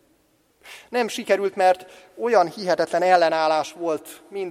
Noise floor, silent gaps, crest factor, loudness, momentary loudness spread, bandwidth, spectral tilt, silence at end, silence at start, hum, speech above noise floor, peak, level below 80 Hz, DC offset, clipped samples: -63 dBFS; none; 20 dB; -22 LUFS; 11 LU; 15.5 kHz; -4 dB/octave; 0 s; 0.65 s; none; 41 dB; -2 dBFS; -72 dBFS; under 0.1%; under 0.1%